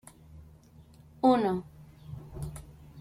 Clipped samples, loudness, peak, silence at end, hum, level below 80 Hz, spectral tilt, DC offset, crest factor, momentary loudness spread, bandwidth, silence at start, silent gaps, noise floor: under 0.1%; -29 LUFS; -12 dBFS; 0 s; none; -54 dBFS; -7 dB/octave; under 0.1%; 20 dB; 27 LU; 15 kHz; 0.35 s; none; -55 dBFS